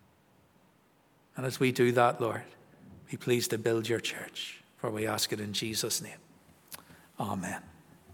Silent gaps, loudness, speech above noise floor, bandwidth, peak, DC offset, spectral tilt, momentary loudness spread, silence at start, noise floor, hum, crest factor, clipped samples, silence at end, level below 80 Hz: none; -31 LUFS; 35 dB; 19 kHz; -10 dBFS; under 0.1%; -4 dB/octave; 21 LU; 1.35 s; -66 dBFS; none; 24 dB; under 0.1%; 0 s; -74 dBFS